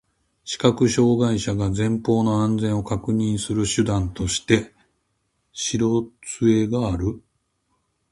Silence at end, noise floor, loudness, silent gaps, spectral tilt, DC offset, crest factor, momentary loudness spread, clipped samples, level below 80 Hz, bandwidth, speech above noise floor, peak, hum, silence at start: 0.95 s; -71 dBFS; -22 LUFS; none; -5.5 dB/octave; under 0.1%; 20 dB; 10 LU; under 0.1%; -42 dBFS; 11.5 kHz; 51 dB; -2 dBFS; none; 0.45 s